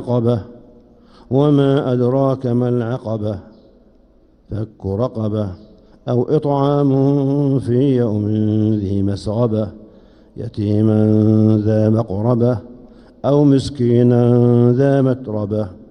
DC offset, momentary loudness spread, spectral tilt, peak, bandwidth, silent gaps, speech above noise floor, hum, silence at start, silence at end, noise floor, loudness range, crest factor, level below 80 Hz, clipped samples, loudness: under 0.1%; 11 LU; -9.5 dB/octave; -2 dBFS; 9.6 kHz; none; 35 dB; none; 0 s; 0.05 s; -51 dBFS; 7 LU; 14 dB; -48 dBFS; under 0.1%; -16 LUFS